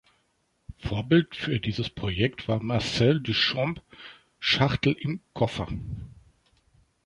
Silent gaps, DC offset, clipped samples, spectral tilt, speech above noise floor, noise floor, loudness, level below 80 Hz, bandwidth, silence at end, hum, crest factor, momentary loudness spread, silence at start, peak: none; under 0.1%; under 0.1%; -6 dB/octave; 45 dB; -71 dBFS; -26 LUFS; -48 dBFS; 11 kHz; 0.9 s; none; 20 dB; 16 LU; 0.7 s; -8 dBFS